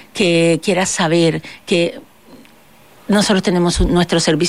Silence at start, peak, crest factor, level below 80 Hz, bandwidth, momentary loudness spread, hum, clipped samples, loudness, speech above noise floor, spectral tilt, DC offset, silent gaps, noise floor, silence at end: 0.15 s; -4 dBFS; 12 dB; -32 dBFS; 15 kHz; 5 LU; none; under 0.1%; -15 LUFS; 32 dB; -4.5 dB/octave; 0.4%; none; -47 dBFS; 0 s